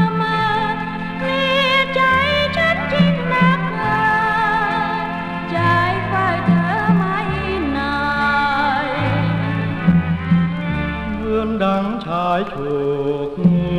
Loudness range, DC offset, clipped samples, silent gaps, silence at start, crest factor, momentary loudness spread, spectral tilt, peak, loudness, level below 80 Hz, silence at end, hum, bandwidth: 3 LU; under 0.1%; under 0.1%; none; 0 s; 16 dB; 7 LU; -7 dB/octave; -2 dBFS; -18 LUFS; -38 dBFS; 0 s; none; 9 kHz